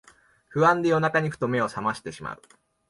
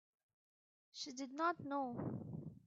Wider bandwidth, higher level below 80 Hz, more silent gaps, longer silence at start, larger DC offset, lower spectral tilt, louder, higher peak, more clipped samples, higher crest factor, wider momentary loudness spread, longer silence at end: first, 11.5 kHz vs 7.6 kHz; first, -62 dBFS vs -80 dBFS; neither; second, 0.5 s vs 0.95 s; neither; first, -6.5 dB/octave vs -4.5 dB/octave; first, -24 LUFS vs -44 LUFS; first, -8 dBFS vs -26 dBFS; neither; about the same, 18 dB vs 20 dB; first, 17 LU vs 10 LU; first, 0.55 s vs 0.1 s